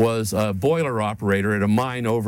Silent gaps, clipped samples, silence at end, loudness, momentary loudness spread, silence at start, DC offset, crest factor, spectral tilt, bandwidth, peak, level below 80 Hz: none; under 0.1%; 0 s; -22 LUFS; 3 LU; 0 s; under 0.1%; 14 dB; -6 dB/octave; 17.5 kHz; -6 dBFS; -54 dBFS